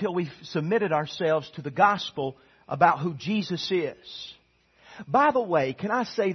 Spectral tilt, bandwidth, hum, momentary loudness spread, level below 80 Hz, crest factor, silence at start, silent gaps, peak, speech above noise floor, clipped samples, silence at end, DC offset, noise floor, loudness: -6 dB/octave; 6.4 kHz; none; 14 LU; -68 dBFS; 22 dB; 0 s; none; -4 dBFS; 36 dB; under 0.1%; 0 s; under 0.1%; -62 dBFS; -26 LUFS